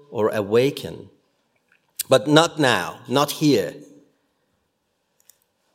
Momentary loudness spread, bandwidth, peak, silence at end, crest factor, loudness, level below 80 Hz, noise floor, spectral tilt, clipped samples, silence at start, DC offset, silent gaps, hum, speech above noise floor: 17 LU; 16.5 kHz; 0 dBFS; 1.9 s; 22 dB; -20 LUFS; -66 dBFS; -72 dBFS; -4.5 dB/octave; under 0.1%; 0.1 s; under 0.1%; none; none; 52 dB